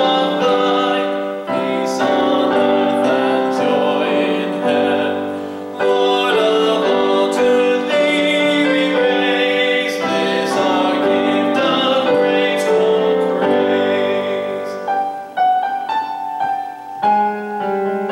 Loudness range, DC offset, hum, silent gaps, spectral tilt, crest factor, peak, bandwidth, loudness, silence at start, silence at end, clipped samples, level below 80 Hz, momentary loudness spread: 4 LU; under 0.1%; none; none; -4.5 dB/octave; 12 dB; -4 dBFS; 16 kHz; -16 LUFS; 0 s; 0 s; under 0.1%; -64 dBFS; 7 LU